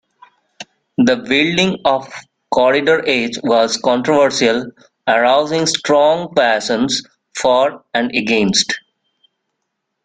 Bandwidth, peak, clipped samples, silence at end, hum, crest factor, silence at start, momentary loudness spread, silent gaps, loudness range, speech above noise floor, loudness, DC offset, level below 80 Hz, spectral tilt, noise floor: 9.6 kHz; 0 dBFS; under 0.1%; 1.25 s; none; 16 dB; 0.6 s; 12 LU; none; 2 LU; 59 dB; -15 LUFS; under 0.1%; -56 dBFS; -3.5 dB/octave; -74 dBFS